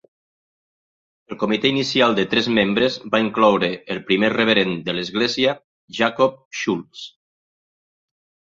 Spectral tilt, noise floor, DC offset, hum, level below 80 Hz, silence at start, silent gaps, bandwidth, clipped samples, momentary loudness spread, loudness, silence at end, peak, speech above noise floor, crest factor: -5 dB/octave; under -90 dBFS; under 0.1%; none; -58 dBFS; 1.3 s; 5.64-5.88 s, 6.45-6.51 s; 7.6 kHz; under 0.1%; 12 LU; -19 LUFS; 1.45 s; -2 dBFS; over 71 dB; 20 dB